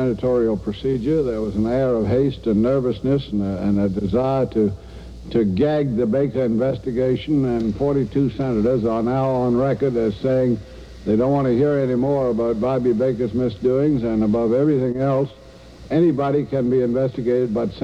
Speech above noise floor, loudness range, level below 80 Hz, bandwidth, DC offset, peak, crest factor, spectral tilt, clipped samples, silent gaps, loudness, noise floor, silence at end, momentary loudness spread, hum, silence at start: 22 dB; 1 LU; -42 dBFS; 9 kHz; 0.1%; -8 dBFS; 12 dB; -9.5 dB/octave; under 0.1%; none; -20 LUFS; -41 dBFS; 0 s; 4 LU; none; 0 s